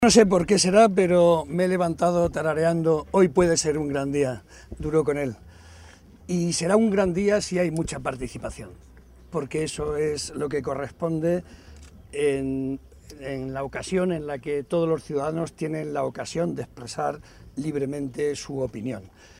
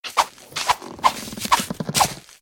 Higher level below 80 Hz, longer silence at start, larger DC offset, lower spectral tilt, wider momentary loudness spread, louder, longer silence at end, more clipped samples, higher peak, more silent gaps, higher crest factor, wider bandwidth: about the same, -48 dBFS vs -52 dBFS; about the same, 0 s vs 0.05 s; neither; first, -5 dB/octave vs -2 dB/octave; first, 15 LU vs 5 LU; about the same, -24 LUFS vs -22 LUFS; about the same, 0.3 s vs 0.2 s; neither; about the same, -2 dBFS vs -2 dBFS; neither; about the same, 22 dB vs 20 dB; second, 15.5 kHz vs 19.5 kHz